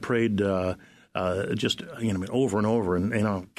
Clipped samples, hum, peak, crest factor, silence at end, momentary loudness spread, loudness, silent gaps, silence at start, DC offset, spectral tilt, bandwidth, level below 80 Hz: under 0.1%; none; -10 dBFS; 16 dB; 0.15 s; 6 LU; -27 LUFS; none; 0 s; under 0.1%; -6 dB/octave; 13.5 kHz; -56 dBFS